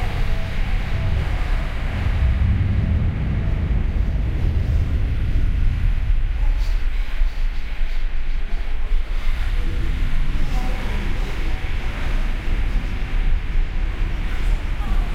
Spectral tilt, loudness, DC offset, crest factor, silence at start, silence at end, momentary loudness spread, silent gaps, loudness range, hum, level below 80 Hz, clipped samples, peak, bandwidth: -7 dB/octave; -25 LUFS; under 0.1%; 10 dB; 0 s; 0 s; 7 LU; none; 5 LU; none; -20 dBFS; under 0.1%; -8 dBFS; 6.6 kHz